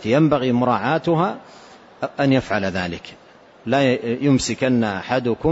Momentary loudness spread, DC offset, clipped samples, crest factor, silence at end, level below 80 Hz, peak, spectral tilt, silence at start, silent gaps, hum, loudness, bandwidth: 12 LU; under 0.1%; under 0.1%; 16 dB; 0 s; -50 dBFS; -4 dBFS; -6 dB/octave; 0 s; none; none; -20 LUFS; 8 kHz